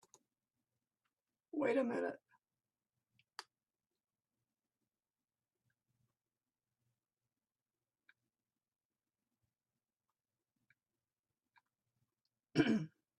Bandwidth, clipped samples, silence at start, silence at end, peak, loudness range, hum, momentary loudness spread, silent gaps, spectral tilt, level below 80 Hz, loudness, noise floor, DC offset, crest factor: 10.5 kHz; under 0.1%; 1.55 s; 0.3 s; -20 dBFS; 21 LU; none; 21 LU; 8.85-8.90 s, 11.19-11.23 s; -6.5 dB/octave; -82 dBFS; -38 LUFS; under -90 dBFS; under 0.1%; 28 dB